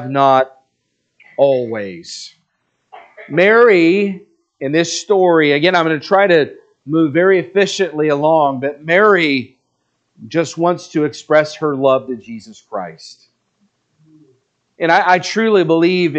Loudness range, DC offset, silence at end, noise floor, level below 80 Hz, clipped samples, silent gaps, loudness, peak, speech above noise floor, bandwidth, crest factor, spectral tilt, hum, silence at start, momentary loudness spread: 7 LU; under 0.1%; 0 s; -69 dBFS; -70 dBFS; under 0.1%; none; -14 LUFS; 0 dBFS; 55 dB; 8.6 kHz; 16 dB; -5 dB/octave; none; 0 s; 16 LU